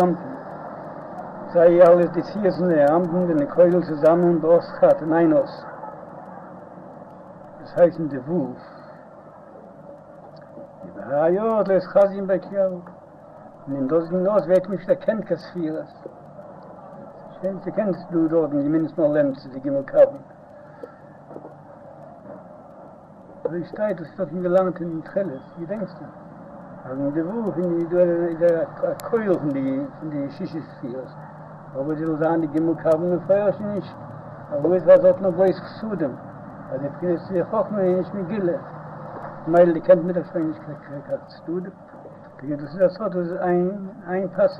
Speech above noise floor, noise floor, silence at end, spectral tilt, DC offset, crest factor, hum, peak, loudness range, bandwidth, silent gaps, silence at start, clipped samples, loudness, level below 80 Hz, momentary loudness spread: 24 dB; -44 dBFS; 0 s; -9.5 dB/octave; under 0.1%; 20 dB; none; -2 dBFS; 9 LU; 5.4 kHz; none; 0 s; under 0.1%; -21 LUFS; -62 dBFS; 24 LU